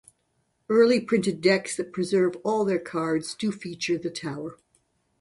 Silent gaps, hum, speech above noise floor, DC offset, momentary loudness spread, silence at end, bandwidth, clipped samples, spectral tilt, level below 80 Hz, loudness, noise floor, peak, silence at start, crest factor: none; none; 48 dB; under 0.1%; 12 LU; 0.65 s; 11.5 kHz; under 0.1%; -5 dB/octave; -68 dBFS; -25 LUFS; -72 dBFS; -8 dBFS; 0.7 s; 18 dB